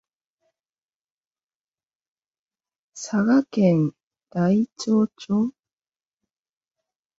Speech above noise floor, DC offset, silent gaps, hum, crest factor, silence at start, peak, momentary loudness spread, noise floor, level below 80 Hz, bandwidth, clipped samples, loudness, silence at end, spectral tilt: over 69 dB; under 0.1%; 4.03-4.11 s; none; 20 dB; 2.95 s; -6 dBFS; 9 LU; under -90 dBFS; -66 dBFS; 7.8 kHz; under 0.1%; -22 LUFS; 1.7 s; -7 dB/octave